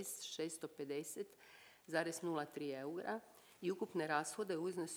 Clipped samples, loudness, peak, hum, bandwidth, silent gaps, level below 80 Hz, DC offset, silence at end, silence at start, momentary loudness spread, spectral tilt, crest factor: under 0.1%; -44 LUFS; -24 dBFS; none; over 20 kHz; none; under -90 dBFS; under 0.1%; 0 s; 0 s; 11 LU; -4 dB/octave; 20 dB